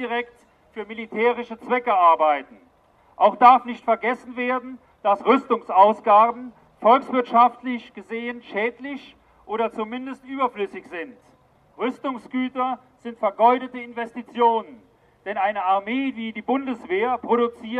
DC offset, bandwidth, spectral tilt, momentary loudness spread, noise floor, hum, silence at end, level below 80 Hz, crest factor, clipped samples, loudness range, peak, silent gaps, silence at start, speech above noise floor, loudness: under 0.1%; 8.6 kHz; -6 dB/octave; 17 LU; -53 dBFS; none; 0 s; -68 dBFS; 22 dB; under 0.1%; 10 LU; 0 dBFS; none; 0 s; 32 dB; -21 LUFS